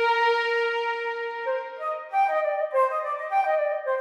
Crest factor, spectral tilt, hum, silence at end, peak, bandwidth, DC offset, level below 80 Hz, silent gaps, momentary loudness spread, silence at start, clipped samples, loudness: 14 dB; 1 dB/octave; none; 0 s; -12 dBFS; 12 kHz; under 0.1%; under -90 dBFS; none; 8 LU; 0 s; under 0.1%; -25 LUFS